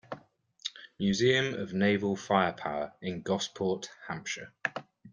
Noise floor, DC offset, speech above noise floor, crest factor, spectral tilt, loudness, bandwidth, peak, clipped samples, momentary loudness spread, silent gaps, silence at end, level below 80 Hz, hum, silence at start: -58 dBFS; under 0.1%; 28 dB; 22 dB; -5 dB/octave; -31 LUFS; 9.8 kHz; -10 dBFS; under 0.1%; 14 LU; none; 0.05 s; -68 dBFS; none; 0.1 s